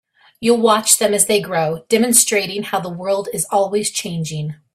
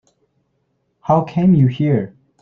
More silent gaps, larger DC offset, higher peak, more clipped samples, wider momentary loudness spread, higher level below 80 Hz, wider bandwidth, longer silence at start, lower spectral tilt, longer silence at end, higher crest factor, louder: neither; neither; about the same, 0 dBFS vs -2 dBFS; neither; second, 11 LU vs 14 LU; second, -60 dBFS vs -52 dBFS; first, 16 kHz vs 6.2 kHz; second, 0.4 s vs 1.1 s; second, -3 dB/octave vs -10.5 dB/octave; second, 0.2 s vs 0.35 s; about the same, 18 dB vs 16 dB; about the same, -16 LUFS vs -16 LUFS